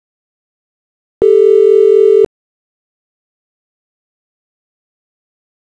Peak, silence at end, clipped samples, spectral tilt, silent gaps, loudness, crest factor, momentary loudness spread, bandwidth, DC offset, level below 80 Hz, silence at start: -2 dBFS; 3.45 s; under 0.1%; -7 dB/octave; none; -9 LUFS; 14 dB; 6 LU; 4.2 kHz; under 0.1%; -54 dBFS; 1.2 s